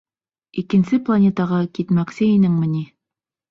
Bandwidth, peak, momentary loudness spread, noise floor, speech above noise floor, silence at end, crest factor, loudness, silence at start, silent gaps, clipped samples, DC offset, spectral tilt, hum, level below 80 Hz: 7.2 kHz; -6 dBFS; 12 LU; -87 dBFS; 69 dB; 0.65 s; 12 dB; -18 LUFS; 0.55 s; none; under 0.1%; under 0.1%; -9 dB/octave; none; -58 dBFS